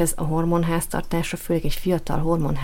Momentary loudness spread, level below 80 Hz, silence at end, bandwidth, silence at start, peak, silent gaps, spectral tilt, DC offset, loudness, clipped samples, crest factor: 4 LU; -32 dBFS; 0 s; 17 kHz; 0 s; -8 dBFS; none; -5.5 dB/octave; under 0.1%; -24 LUFS; under 0.1%; 14 dB